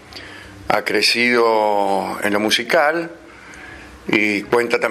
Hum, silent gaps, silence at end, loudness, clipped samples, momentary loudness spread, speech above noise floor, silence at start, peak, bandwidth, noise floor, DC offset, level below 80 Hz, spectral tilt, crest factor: none; none; 0 s; -17 LUFS; under 0.1%; 21 LU; 21 dB; 0.1 s; 0 dBFS; 15.5 kHz; -39 dBFS; under 0.1%; -52 dBFS; -3 dB/octave; 18 dB